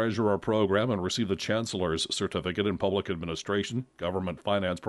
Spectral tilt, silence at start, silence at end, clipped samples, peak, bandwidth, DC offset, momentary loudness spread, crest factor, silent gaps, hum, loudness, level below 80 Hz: -5 dB/octave; 0 s; 0 s; under 0.1%; -12 dBFS; 11.5 kHz; under 0.1%; 7 LU; 16 dB; none; none; -29 LUFS; -56 dBFS